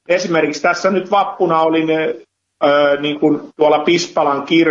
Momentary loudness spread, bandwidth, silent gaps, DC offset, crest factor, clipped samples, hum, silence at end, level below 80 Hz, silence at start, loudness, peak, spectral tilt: 4 LU; 7.6 kHz; none; under 0.1%; 12 dB; under 0.1%; none; 0 s; -66 dBFS; 0.1 s; -15 LUFS; -2 dBFS; -4.5 dB/octave